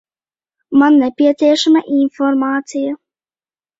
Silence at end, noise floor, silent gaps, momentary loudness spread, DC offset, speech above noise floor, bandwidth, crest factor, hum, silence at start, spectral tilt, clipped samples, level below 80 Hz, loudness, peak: 0.85 s; under -90 dBFS; none; 11 LU; under 0.1%; over 77 dB; 7.8 kHz; 14 dB; none; 0.7 s; -3.5 dB/octave; under 0.1%; -64 dBFS; -14 LUFS; -2 dBFS